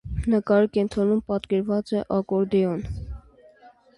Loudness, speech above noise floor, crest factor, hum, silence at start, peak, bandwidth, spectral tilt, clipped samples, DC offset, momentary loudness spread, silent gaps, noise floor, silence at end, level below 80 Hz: -23 LUFS; 30 dB; 16 dB; none; 0.05 s; -8 dBFS; 11 kHz; -8.5 dB/octave; under 0.1%; under 0.1%; 14 LU; none; -53 dBFS; 0.3 s; -40 dBFS